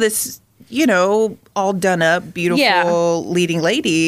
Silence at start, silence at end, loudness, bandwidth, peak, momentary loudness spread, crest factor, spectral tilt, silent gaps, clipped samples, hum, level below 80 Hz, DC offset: 0 s; 0 s; -17 LUFS; 15.5 kHz; -2 dBFS; 7 LU; 14 dB; -4 dB/octave; none; under 0.1%; none; -56 dBFS; under 0.1%